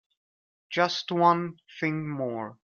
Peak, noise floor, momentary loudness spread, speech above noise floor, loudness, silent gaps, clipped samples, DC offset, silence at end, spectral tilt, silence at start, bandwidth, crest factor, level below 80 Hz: -8 dBFS; under -90 dBFS; 11 LU; over 63 dB; -27 LUFS; none; under 0.1%; under 0.1%; 0.2 s; -5.5 dB/octave; 0.7 s; 7.2 kHz; 20 dB; -72 dBFS